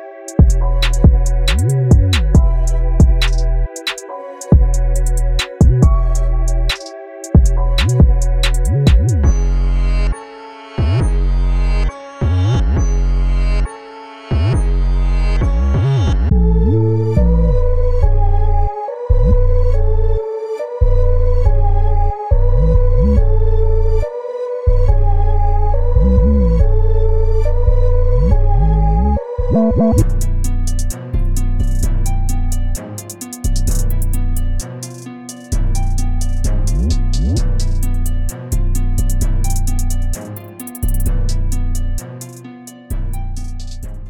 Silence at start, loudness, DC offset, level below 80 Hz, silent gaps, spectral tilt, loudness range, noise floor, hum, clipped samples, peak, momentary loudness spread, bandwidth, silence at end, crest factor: 0 s; -17 LUFS; under 0.1%; -14 dBFS; none; -6.5 dB/octave; 6 LU; -34 dBFS; none; under 0.1%; 0 dBFS; 12 LU; 14.5 kHz; 0 s; 12 dB